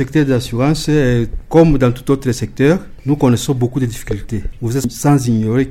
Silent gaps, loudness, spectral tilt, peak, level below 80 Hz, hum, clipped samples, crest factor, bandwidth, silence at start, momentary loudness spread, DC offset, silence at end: none; -15 LUFS; -6.5 dB/octave; 0 dBFS; -30 dBFS; none; under 0.1%; 14 dB; 16 kHz; 0 s; 9 LU; under 0.1%; 0 s